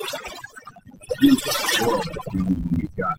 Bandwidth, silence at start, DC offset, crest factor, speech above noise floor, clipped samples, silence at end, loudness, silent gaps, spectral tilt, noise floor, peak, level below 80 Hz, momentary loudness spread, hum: 16.5 kHz; 0 s; under 0.1%; 18 dB; 23 dB; under 0.1%; 0 s; -22 LUFS; none; -4.5 dB/octave; -44 dBFS; -4 dBFS; -42 dBFS; 19 LU; none